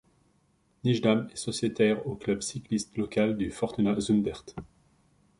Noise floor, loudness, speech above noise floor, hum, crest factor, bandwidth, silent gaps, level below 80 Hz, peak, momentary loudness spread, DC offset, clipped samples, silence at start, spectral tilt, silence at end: -68 dBFS; -29 LUFS; 40 dB; none; 20 dB; 11.5 kHz; none; -56 dBFS; -10 dBFS; 8 LU; under 0.1%; under 0.1%; 0.85 s; -5.5 dB/octave; 0.75 s